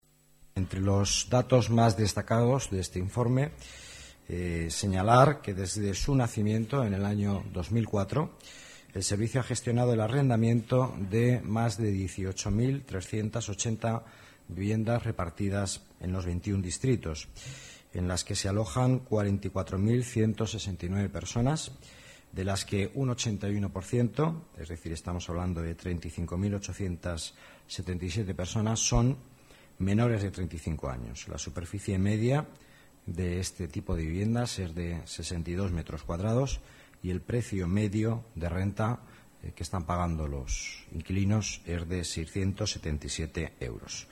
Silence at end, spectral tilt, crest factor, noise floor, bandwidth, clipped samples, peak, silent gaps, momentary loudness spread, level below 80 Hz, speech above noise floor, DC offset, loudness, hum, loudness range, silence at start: 0.05 s; -5.5 dB/octave; 22 dB; -59 dBFS; 13.5 kHz; under 0.1%; -8 dBFS; none; 13 LU; -46 dBFS; 29 dB; under 0.1%; -31 LUFS; none; 6 LU; 0.55 s